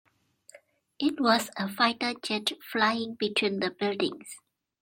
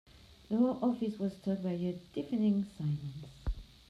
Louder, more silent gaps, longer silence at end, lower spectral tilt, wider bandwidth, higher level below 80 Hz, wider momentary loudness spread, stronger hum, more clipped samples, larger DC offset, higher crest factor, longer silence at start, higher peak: first, -28 LUFS vs -35 LUFS; neither; first, 0.45 s vs 0.25 s; second, -3.5 dB/octave vs -9 dB/octave; first, 16.5 kHz vs 10.5 kHz; second, -74 dBFS vs -48 dBFS; second, 8 LU vs 12 LU; neither; neither; neither; first, 22 dB vs 16 dB; first, 1 s vs 0.15 s; first, -8 dBFS vs -20 dBFS